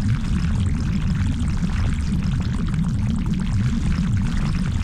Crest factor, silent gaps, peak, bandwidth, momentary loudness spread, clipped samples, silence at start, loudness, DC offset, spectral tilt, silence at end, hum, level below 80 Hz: 12 dB; none; -10 dBFS; 10.5 kHz; 1 LU; under 0.1%; 0 s; -23 LUFS; under 0.1%; -7 dB/octave; 0 s; none; -26 dBFS